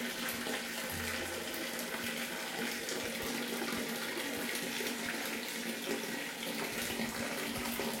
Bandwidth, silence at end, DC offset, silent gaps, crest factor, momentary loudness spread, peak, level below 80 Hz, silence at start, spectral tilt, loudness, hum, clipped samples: 17 kHz; 0 s; under 0.1%; none; 18 dB; 2 LU; -20 dBFS; -66 dBFS; 0 s; -2 dB/octave; -37 LUFS; none; under 0.1%